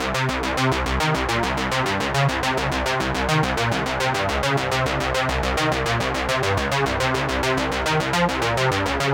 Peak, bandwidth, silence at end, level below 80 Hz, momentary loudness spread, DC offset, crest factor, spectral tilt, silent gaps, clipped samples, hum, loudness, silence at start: -6 dBFS; 17 kHz; 0 s; -34 dBFS; 2 LU; under 0.1%; 16 dB; -4.5 dB/octave; none; under 0.1%; none; -21 LUFS; 0 s